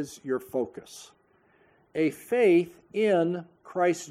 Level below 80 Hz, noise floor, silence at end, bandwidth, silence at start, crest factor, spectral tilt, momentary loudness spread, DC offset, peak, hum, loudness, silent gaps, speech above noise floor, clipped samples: -72 dBFS; -64 dBFS; 0 s; 15 kHz; 0 s; 16 dB; -6 dB/octave; 15 LU; under 0.1%; -12 dBFS; none; -27 LUFS; none; 37 dB; under 0.1%